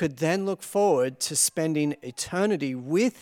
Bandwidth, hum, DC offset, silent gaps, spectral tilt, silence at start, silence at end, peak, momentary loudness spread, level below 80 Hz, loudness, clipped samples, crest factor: 18 kHz; none; under 0.1%; none; -4 dB/octave; 0 s; 0 s; -10 dBFS; 6 LU; -66 dBFS; -25 LUFS; under 0.1%; 16 dB